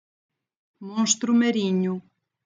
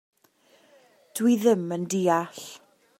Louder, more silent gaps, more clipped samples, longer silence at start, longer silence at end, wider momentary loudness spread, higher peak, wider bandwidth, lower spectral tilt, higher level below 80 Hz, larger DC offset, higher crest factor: about the same, -23 LUFS vs -24 LUFS; neither; neither; second, 0.8 s vs 1.15 s; about the same, 0.45 s vs 0.45 s; second, 14 LU vs 17 LU; first, -4 dBFS vs -8 dBFS; second, 9.6 kHz vs 16 kHz; second, -4 dB/octave vs -5.5 dB/octave; second, -90 dBFS vs -78 dBFS; neither; about the same, 20 dB vs 18 dB